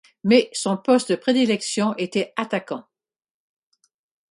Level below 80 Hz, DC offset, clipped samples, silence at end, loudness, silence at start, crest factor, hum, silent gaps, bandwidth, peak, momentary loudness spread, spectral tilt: -68 dBFS; under 0.1%; under 0.1%; 1.5 s; -21 LUFS; 0.25 s; 20 dB; none; none; 11.5 kHz; -2 dBFS; 9 LU; -4.5 dB/octave